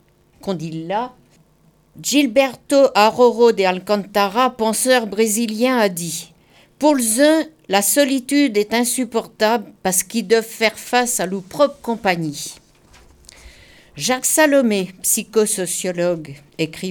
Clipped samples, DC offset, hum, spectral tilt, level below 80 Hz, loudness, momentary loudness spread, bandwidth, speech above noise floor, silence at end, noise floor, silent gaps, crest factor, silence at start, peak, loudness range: under 0.1%; under 0.1%; none; -3 dB/octave; -56 dBFS; -17 LUFS; 12 LU; over 20 kHz; 38 dB; 0 s; -55 dBFS; none; 18 dB; 0.45 s; -2 dBFS; 4 LU